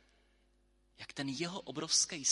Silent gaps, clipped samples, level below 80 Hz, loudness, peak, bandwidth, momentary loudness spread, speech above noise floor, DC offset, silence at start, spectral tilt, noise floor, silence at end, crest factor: none; under 0.1%; -72 dBFS; -34 LUFS; -16 dBFS; 11.5 kHz; 16 LU; 36 dB; under 0.1%; 1 s; -1.5 dB/octave; -72 dBFS; 0 s; 22 dB